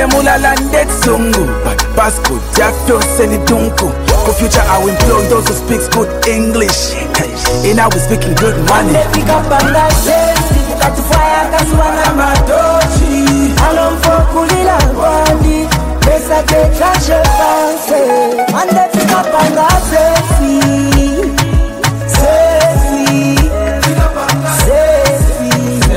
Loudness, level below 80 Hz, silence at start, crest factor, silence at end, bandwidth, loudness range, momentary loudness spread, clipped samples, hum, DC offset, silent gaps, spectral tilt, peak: -10 LUFS; -16 dBFS; 0 s; 10 dB; 0 s; 16.5 kHz; 1 LU; 4 LU; under 0.1%; none; under 0.1%; none; -4.5 dB/octave; 0 dBFS